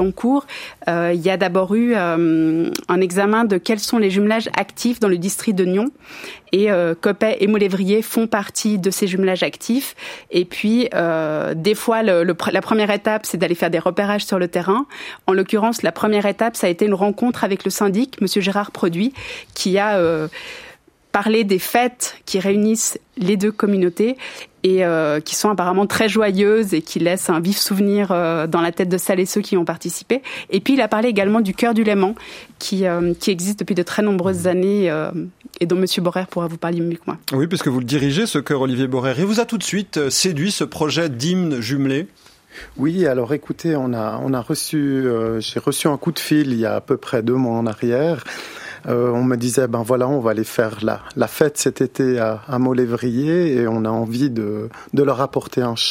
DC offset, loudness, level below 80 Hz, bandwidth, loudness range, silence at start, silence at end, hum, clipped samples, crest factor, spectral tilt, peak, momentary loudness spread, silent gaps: under 0.1%; -19 LUFS; -56 dBFS; 16.5 kHz; 3 LU; 0 s; 0 s; none; under 0.1%; 18 dB; -5 dB/octave; 0 dBFS; 6 LU; none